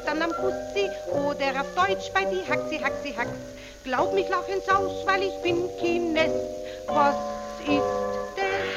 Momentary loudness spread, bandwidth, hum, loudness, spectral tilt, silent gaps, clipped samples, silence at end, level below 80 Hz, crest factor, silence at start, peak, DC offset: 7 LU; 16 kHz; none; -26 LUFS; -4.5 dB/octave; none; under 0.1%; 0 s; -52 dBFS; 18 dB; 0 s; -8 dBFS; under 0.1%